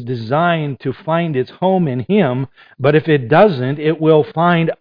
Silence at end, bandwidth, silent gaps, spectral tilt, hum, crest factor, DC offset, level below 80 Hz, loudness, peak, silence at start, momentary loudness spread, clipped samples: 0.05 s; 5.2 kHz; none; -10 dB/octave; none; 14 dB; under 0.1%; -54 dBFS; -15 LUFS; 0 dBFS; 0 s; 8 LU; under 0.1%